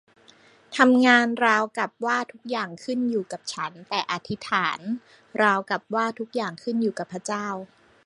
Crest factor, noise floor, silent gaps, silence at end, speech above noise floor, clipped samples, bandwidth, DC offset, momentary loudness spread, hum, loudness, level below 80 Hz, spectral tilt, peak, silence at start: 22 dB; -55 dBFS; none; 0.4 s; 31 dB; under 0.1%; 11 kHz; under 0.1%; 15 LU; none; -24 LUFS; -72 dBFS; -4 dB/octave; -2 dBFS; 0.7 s